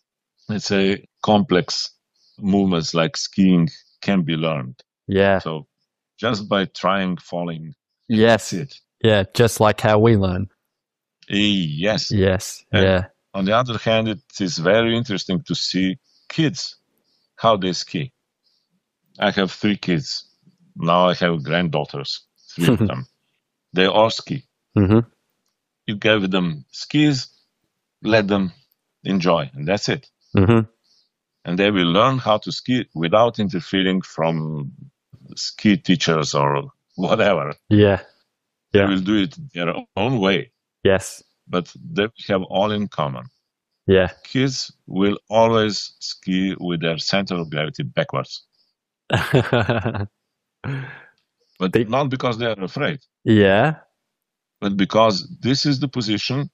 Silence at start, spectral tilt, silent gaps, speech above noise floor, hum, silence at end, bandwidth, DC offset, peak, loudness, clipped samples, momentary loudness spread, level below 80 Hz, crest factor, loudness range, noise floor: 0.5 s; -5.5 dB/octave; none; 63 dB; none; 0.05 s; 14.5 kHz; under 0.1%; -2 dBFS; -20 LUFS; under 0.1%; 13 LU; -52 dBFS; 18 dB; 4 LU; -82 dBFS